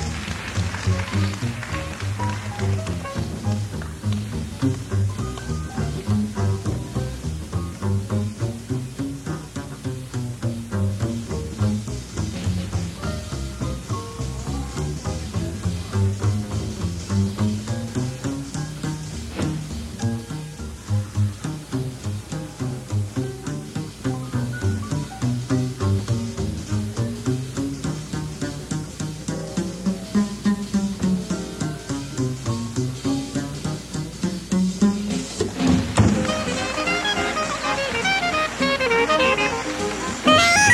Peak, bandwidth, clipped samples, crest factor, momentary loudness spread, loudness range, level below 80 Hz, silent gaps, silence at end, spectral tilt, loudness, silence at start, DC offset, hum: -2 dBFS; 13.5 kHz; under 0.1%; 20 dB; 10 LU; 7 LU; -38 dBFS; none; 0 s; -5 dB/octave; -25 LUFS; 0 s; under 0.1%; none